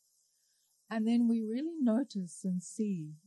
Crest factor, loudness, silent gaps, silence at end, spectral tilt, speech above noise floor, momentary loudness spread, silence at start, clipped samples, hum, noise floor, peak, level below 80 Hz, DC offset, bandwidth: 12 dB; -33 LUFS; none; 0.1 s; -6.5 dB/octave; 42 dB; 9 LU; 0.9 s; under 0.1%; none; -74 dBFS; -22 dBFS; under -90 dBFS; under 0.1%; 11 kHz